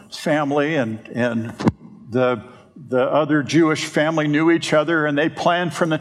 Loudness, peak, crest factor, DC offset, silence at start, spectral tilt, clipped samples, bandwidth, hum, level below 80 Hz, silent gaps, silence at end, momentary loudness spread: -19 LUFS; 0 dBFS; 18 dB; under 0.1%; 0.1 s; -5.5 dB/octave; under 0.1%; 12.5 kHz; none; -58 dBFS; none; 0 s; 6 LU